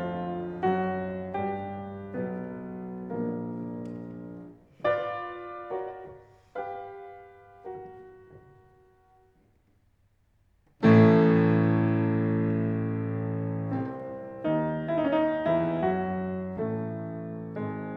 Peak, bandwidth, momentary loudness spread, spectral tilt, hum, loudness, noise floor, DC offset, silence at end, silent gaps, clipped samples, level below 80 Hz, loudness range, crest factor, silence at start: -8 dBFS; 5.4 kHz; 20 LU; -10 dB/octave; none; -28 LUFS; -66 dBFS; under 0.1%; 0 s; none; under 0.1%; -62 dBFS; 17 LU; 20 dB; 0 s